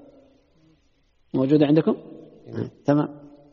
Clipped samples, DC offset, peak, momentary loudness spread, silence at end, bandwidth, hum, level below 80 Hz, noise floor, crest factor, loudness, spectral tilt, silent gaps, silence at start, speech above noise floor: under 0.1%; under 0.1%; -6 dBFS; 16 LU; 0.35 s; 6 kHz; none; -64 dBFS; -63 dBFS; 18 dB; -23 LUFS; -8 dB/octave; none; 1.35 s; 42 dB